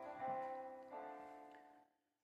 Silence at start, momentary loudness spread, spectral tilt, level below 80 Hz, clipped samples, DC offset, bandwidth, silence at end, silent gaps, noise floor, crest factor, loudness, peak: 0 s; 17 LU; -6 dB/octave; -90 dBFS; under 0.1%; under 0.1%; 12 kHz; 0.4 s; none; -73 dBFS; 18 dB; -50 LUFS; -34 dBFS